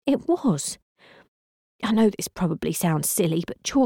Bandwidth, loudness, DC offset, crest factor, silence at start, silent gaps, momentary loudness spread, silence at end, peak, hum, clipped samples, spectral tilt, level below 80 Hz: 17.5 kHz; -24 LUFS; under 0.1%; 14 dB; 0.05 s; 0.82-0.96 s, 1.28-1.79 s; 8 LU; 0 s; -10 dBFS; none; under 0.1%; -5 dB/octave; -54 dBFS